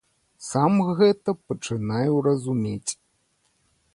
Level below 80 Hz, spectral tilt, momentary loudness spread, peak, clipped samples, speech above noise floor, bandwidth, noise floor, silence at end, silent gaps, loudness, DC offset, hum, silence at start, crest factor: -62 dBFS; -6 dB/octave; 11 LU; -8 dBFS; under 0.1%; 46 dB; 11.5 kHz; -68 dBFS; 1 s; none; -23 LUFS; under 0.1%; none; 0.4 s; 16 dB